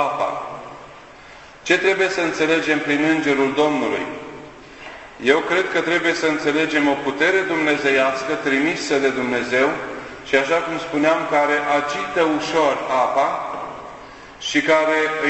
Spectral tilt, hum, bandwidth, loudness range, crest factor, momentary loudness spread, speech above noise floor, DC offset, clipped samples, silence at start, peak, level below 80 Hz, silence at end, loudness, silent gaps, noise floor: -4 dB/octave; none; 8.4 kHz; 2 LU; 18 dB; 16 LU; 23 dB; under 0.1%; under 0.1%; 0 s; -2 dBFS; -56 dBFS; 0 s; -19 LUFS; none; -42 dBFS